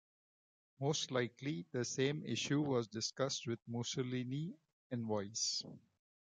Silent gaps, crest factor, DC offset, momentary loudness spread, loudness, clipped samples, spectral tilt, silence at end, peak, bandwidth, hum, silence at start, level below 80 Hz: 4.73-4.90 s; 18 dB; under 0.1%; 7 LU; -39 LUFS; under 0.1%; -4 dB/octave; 0.6 s; -24 dBFS; 9.6 kHz; none; 0.8 s; -78 dBFS